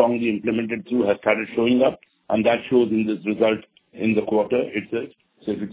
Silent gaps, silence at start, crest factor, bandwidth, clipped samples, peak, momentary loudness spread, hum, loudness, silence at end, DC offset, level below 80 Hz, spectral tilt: none; 0 s; 20 dB; 4 kHz; under 0.1%; -2 dBFS; 10 LU; none; -22 LUFS; 0 s; under 0.1%; -58 dBFS; -10 dB/octave